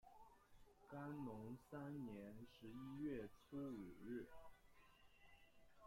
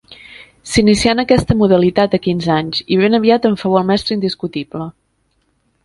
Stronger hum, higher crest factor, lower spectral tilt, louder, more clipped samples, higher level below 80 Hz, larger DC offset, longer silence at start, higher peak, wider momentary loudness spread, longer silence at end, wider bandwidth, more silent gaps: neither; about the same, 16 dB vs 16 dB; first, -7.5 dB/octave vs -5.5 dB/octave; second, -55 LUFS vs -14 LUFS; neither; second, -74 dBFS vs -38 dBFS; neither; about the same, 0.05 s vs 0.1 s; second, -40 dBFS vs 0 dBFS; about the same, 10 LU vs 12 LU; second, 0 s vs 0.95 s; first, 16.5 kHz vs 11.5 kHz; neither